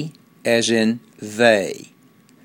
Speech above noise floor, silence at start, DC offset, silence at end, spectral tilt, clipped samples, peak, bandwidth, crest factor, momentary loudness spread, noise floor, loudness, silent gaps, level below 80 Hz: 34 dB; 0 s; under 0.1%; 0.6 s; -4 dB/octave; under 0.1%; 0 dBFS; 16.5 kHz; 20 dB; 17 LU; -52 dBFS; -19 LUFS; none; -66 dBFS